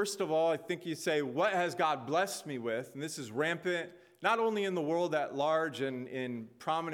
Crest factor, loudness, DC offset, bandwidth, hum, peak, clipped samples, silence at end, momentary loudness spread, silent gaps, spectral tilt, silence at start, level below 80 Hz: 20 dB; -33 LUFS; under 0.1%; 17.5 kHz; none; -14 dBFS; under 0.1%; 0 s; 8 LU; none; -4.5 dB/octave; 0 s; -82 dBFS